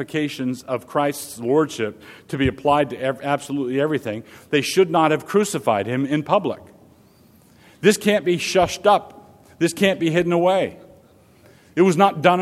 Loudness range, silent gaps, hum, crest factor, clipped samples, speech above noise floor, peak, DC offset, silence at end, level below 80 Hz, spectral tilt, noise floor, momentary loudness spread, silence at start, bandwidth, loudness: 3 LU; none; none; 20 dB; under 0.1%; 33 dB; 0 dBFS; under 0.1%; 0 s; -52 dBFS; -5 dB/octave; -52 dBFS; 11 LU; 0 s; 16 kHz; -20 LUFS